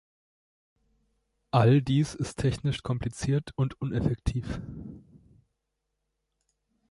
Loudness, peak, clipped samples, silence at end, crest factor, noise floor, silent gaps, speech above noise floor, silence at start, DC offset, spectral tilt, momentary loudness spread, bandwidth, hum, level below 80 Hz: -28 LUFS; -8 dBFS; under 0.1%; 1.9 s; 22 dB; -82 dBFS; none; 55 dB; 1.55 s; under 0.1%; -7 dB/octave; 16 LU; 11.5 kHz; none; -46 dBFS